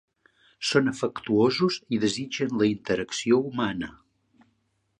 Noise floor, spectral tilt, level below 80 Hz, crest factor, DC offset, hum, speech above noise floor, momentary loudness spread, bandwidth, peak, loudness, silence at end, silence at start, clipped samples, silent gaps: -72 dBFS; -5 dB/octave; -62 dBFS; 20 dB; under 0.1%; none; 47 dB; 8 LU; 11 kHz; -6 dBFS; -26 LUFS; 1.1 s; 0.6 s; under 0.1%; none